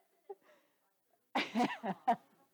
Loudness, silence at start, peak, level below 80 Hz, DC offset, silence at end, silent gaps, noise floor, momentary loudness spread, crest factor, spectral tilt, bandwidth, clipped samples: -37 LUFS; 0.3 s; -20 dBFS; under -90 dBFS; under 0.1%; 0.35 s; none; -78 dBFS; 20 LU; 20 dB; -5 dB/octave; over 20 kHz; under 0.1%